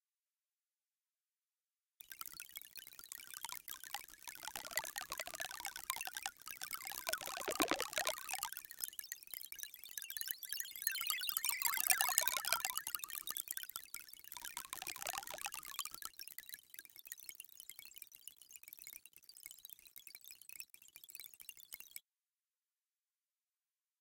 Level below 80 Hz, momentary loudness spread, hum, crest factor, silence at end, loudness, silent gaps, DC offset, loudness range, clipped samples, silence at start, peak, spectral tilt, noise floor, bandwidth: -78 dBFS; 18 LU; none; 42 dB; 2 s; -41 LUFS; none; under 0.1%; 17 LU; under 0.1%; 2.05 s; -4 dBFS; 1 dB/octave; under -90 dBFS; 17 kHz